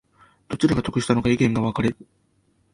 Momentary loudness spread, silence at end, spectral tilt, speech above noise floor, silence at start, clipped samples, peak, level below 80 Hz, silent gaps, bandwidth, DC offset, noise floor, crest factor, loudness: 9 LU; 0.8 s; -6.5 dB/octave; 43 dB; 0.5 s; under 0.1%; -4 dBFS; -46 dBFS; none; 11.5 kHz; under 0.1%; -64 dBFS; 18 dB; -22 LUFS